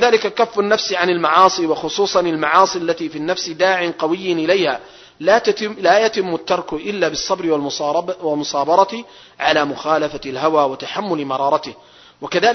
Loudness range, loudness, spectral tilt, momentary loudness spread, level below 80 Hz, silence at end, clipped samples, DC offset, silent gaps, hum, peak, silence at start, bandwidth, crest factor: 3 LU; -17 LUFS; -3.5 dB/octave; 8 LU; -56 dBFS; 0 s; under 0.1%; under 0.1%; none; none; 0 dBFS; 0 s; 6.4 kHz; 18 dB